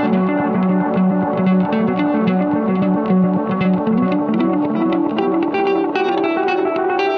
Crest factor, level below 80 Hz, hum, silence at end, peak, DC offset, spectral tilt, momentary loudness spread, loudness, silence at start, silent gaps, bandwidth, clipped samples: 12 dB; -58 dBFS; none; 0 s; -4 dBFS; under 0.1%; -9.5 dB/octave; 2 LU; -17 LUFS; 0 s; none; 5.8 kHz; under 0.1%